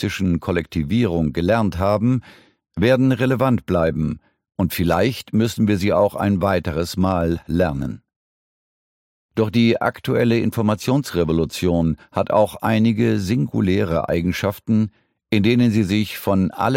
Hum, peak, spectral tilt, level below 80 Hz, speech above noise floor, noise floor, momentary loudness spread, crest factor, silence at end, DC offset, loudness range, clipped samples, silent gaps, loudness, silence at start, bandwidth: none; -2 dBFS; -7 dB/octave; -42 dBFS; over 71 dB; under -90 dBFS; 6 LU; 16 dB; 0 s; under 0.1%; 3 LU; under 0.1%; 8.16-9.29 s; -20 LUFS; 0 s; 16.5 kHz